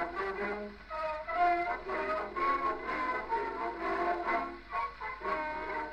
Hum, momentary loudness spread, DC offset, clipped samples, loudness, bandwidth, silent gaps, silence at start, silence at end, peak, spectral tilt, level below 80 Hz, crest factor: none; 7 LU; under 0.1%; under 0.1%; -34 LUFS; 9.2 kHz; none; 0 s; 0 s; -18 dBFS; -5.5 dB/octave; -56 dBFS; 18 dB